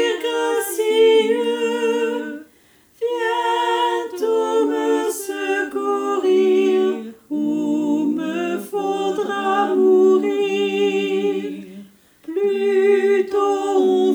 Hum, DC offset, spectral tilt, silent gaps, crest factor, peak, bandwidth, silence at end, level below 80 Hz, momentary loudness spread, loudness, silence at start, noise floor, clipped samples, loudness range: none; under 0.1%; -4 dB/octave; none; 14 dB; -6 dBFS; over 20 kHz; 0 s; -72 dBFS; 9 LU; -19 LUFS; 0 s; -54 dBFS; under 0.1%; 2 LU